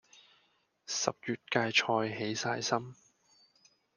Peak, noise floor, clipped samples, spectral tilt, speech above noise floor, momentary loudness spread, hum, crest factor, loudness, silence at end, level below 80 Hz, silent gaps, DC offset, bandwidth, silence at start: -10 dBFS; -73 dBFS; under 0.1%; -3 dB/octave; 40 dB; 11 LU; none; 24 dB; -32 LUFS; 1.05 s; -78 dBFS; none; under 0.1%; 11 kHz; 0.9 s